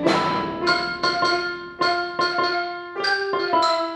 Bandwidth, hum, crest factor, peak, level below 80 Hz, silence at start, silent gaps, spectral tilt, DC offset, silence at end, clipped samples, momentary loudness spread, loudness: 11.5 kHz; none; 18 dB; -4 dBFS; -56 dBFS; 0 s; none; -4 dB/octave; under 0.1%; 0 s; under 0.1%; 5 LU; -22 LUFS